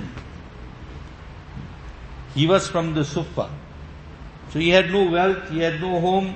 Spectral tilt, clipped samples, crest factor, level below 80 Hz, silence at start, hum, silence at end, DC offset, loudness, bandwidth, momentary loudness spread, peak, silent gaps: -5.5 dB/octave; under 0.1%; 20 dB; -42 dBFS; 0 s; none; 0 s; under 0.1%; -21 LUFS; 8.6 kHz; 23 LU; -2 dBFS; none